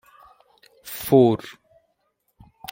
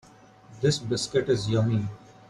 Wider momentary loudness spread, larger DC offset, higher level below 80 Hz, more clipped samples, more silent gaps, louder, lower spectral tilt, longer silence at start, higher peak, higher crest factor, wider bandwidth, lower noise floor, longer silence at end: first, 26 LU vs 4 LU; neither; about the same, -60 dBFS vs -56 dBFS; neither; neither; first, -19 LUFS vs -26 LUFS; first, -7 dB/octave vs -5.5 dB/octave; first, 0.85 s vs 0.5 s; first, -2 dBFS vs -10 dBFS; first, 22 dB vs 16 dB; first, 16.5 kHz vs 11.5 kHz; first, -71 dBFS vs -52 dBFS; first, 1.35 s vs 0.35 s